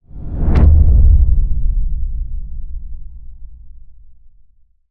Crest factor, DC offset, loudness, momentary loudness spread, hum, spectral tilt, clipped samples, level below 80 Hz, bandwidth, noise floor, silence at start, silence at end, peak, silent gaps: 14 dB; under 0.1%; -15 LUFS; 22 LU; none; -11 dB/octave; under 0.1%; -16 dBFS; 2.9 kHz; -48 dBFS; 0.15 s; 0.75 s; 0 dBFS; none